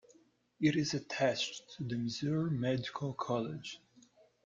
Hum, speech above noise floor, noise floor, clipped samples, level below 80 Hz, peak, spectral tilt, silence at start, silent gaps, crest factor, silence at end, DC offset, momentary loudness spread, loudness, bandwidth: none; 32 dB; -67 dBFS; under 0.1%; -70 dBFS; -18 dBFS; -5.5 dB/octave; 0.6 s; none; 18 dB; 0.45 s; under 0.1%; 10 LU; -35 LUFS; 7.6 kHz